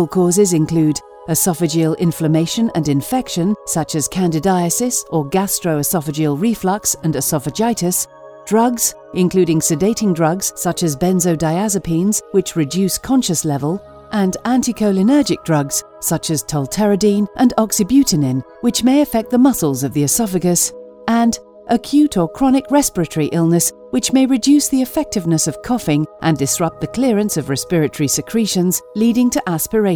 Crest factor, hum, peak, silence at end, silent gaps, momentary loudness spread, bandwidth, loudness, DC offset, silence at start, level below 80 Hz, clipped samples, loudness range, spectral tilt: 14 dB; none; -2 dBFS; 0 s; none; 6 LU; over 20 kHz; -16 LUFS; under 0.1%; 0 s; -46 dBFS; under 0.1%; 2 LU; -5 dB/octave